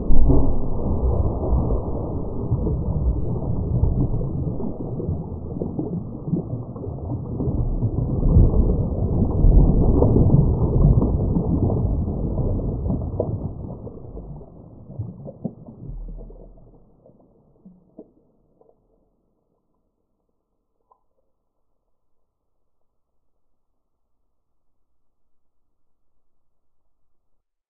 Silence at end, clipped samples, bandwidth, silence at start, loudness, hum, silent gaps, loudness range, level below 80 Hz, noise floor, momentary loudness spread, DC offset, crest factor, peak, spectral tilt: 9.65 s; under 0.1%; 1.4 kHz; 0 s; -22 LUFS; none; none; 19 LU; -26 dBFS; -71 dBFS; 18 LU; under 0.1%; 22 dB; 0 dBFS; -9 dB/octave